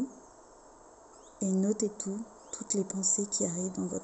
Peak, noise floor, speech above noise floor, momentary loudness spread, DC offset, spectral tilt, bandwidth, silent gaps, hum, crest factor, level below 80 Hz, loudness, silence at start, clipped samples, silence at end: -14 dBFS; -55 dBFS; 23 dB; 12 LU; under 0.1%; -4.5 dB/octave; 8.8 kHz; none; none; 20 dB; -68 dBFS; -32 LUFS; 0 s; under 0.1%; 0 s